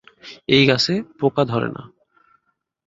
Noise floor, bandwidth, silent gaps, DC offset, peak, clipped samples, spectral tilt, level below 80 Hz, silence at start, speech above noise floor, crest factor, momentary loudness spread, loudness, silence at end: -68 dBFS; 7.8 kHz; none; under 0.1%; -2 dBFS; under 0.1%; -5.5 dB/octave; -56 dBFS; 0.25 s; 50 dB; 20 dB; 20 LU; -18 LUFS; 1 s